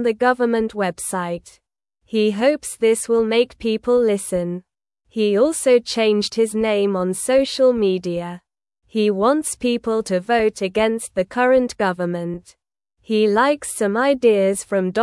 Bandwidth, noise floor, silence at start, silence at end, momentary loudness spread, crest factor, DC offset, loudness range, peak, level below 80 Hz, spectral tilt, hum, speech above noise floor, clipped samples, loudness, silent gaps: 12 kHz; -66 dBFS; 0 s; 0 s; 9 LU; 16 dB; under 0.1%; 2 LU; -4 dBFS; -54 dBFS; -4.5 dB/octave; none; 48 dB; under 0.1%; -19 LUFS; none